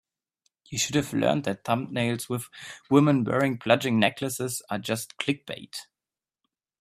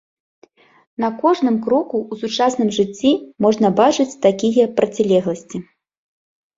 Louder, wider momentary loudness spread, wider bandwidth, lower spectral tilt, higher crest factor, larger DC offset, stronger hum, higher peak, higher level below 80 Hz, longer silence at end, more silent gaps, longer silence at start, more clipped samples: second, -26 LUFS vs -17 LUFS; first, 14 LU vs 9 LU; first, 16 kHz vs 7.8 kHz; about the same, -5 dB/octave vs -5.5 dB/octave; first, 24 dB vs 18 dB; neither; neither; about the same, -4 dBFS vs -2 dBFS; about the same, -64 dBFS vs -60 dBFS; about the same, 0.95 s vs 0.95 s; neither; second, 0.7 s vs 1 s; neither